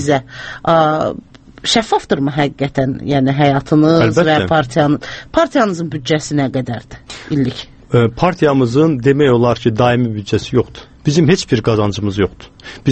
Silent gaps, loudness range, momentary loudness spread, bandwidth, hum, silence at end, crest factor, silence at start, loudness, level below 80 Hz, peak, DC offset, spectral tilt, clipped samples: none; 3 LU; 10 LU; 8.8 kHz; none; 0 s; 14 dB; 0 s; -15 LUFS; -42 dBFS; 0 dBFS; under 0.1%; -6 dB/octave; under 0.1%